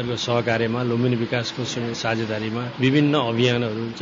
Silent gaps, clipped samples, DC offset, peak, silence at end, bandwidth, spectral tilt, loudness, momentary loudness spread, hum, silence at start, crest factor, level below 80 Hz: none; under 0.1%; under 0.1%; -6 dBFS; 0 s; 7.6 kHz; -5.5 dB/octave; -22 LUFS; 7 LU; none; 0 s; 16 dB; -58 dBFS